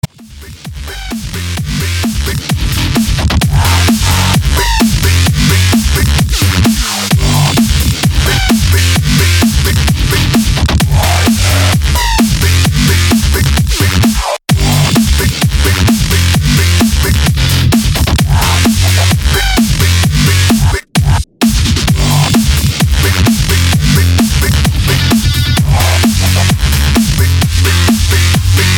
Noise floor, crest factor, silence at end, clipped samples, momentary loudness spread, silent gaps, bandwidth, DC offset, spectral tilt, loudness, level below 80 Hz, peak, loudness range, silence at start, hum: -31 dBFS; 10 dB; 0 s; under 0.1%; 4 LU; none; 19.5 kHz; under 0.1%; -4.5 dB/octave; -10 LUFS; -16 dBFS; 0 dBFS; 1 LU; 0.05 s; none